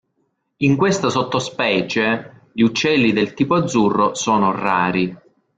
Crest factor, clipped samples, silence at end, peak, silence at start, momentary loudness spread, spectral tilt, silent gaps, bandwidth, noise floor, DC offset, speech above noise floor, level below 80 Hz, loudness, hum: 14 dB; under 0.1%; 0.4 s; -4 dBFS; 0.6 s; 5 LU; -5 dB/octave; none; 9.4 kHz; -69 dBFS; under 0.1%; 51 dB; -54 dBFS; -18 LUFS; none